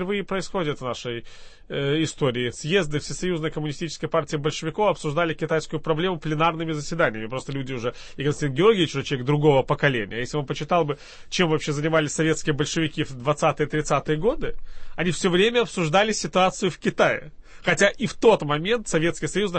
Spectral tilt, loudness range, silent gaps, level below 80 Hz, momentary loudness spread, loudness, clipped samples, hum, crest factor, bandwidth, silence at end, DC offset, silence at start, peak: -5 dB/octave; 4 LU; none; -44 dBFS; 10 LU; -24 LUFS; under 0.1%; none; 18 dB; 8.8 kHz; 0 s; under 0.1%; 0 s; -6 dBFS